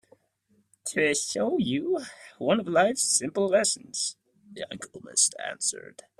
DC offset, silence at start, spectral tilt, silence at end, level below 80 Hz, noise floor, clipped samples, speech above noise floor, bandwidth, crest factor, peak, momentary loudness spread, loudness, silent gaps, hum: under 0.1%; 0.85 s; -2.5 dB/octave; 0.4 s; -70 dBFS; -69 dBFS; under 0.1%; 41 dB; 15 kHz; 18 dB; -10 dBFS; 15 LU; -26 LUFS; none; none